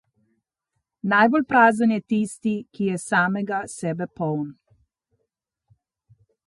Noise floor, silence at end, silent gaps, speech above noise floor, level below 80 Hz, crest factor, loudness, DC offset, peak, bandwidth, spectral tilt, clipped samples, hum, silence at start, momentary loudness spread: -79 dBFS; 1.95 s; none; 58 dB; -66 dBFS; 20 dB; -22 LUFS; under 0.1%; -4 dBFS; 11.5 kHz; -6 dB/octave; under 0.1%; none; 1.05 s; 12 LU